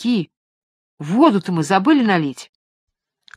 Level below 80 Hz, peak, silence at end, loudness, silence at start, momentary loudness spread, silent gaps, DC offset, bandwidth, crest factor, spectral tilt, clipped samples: -68 dBFS; 0 dBFS; 0.9 s; -17 LUFS; 0 s; 19 LU; 0.37-0.97 s; under 0.1%; 13 kHz; 18 dB; -6 dB/octave; under 0.1%